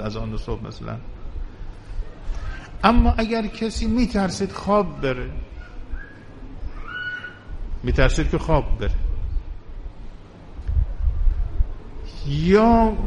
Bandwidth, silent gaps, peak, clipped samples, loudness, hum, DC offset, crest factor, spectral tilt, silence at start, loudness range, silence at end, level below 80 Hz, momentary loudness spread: 11 kHz; none; -2 dBFS; under 0.1%; -23 LUFS; none; under 0.1%; 20 dB; -6.5 dB/octave; 0 s; 7 LU; 0 s; -26 dBFS; 21 LU